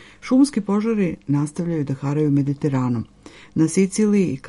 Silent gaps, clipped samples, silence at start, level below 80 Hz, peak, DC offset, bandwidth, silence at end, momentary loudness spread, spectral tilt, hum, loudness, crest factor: none; under 0.1%; 0 s; -54 dBFS; -6 dBFS; under 0.1%; 11.5 kHz; 0 s; 7 LU; -7 dB/octave; none; -21 LUFS; 14 dB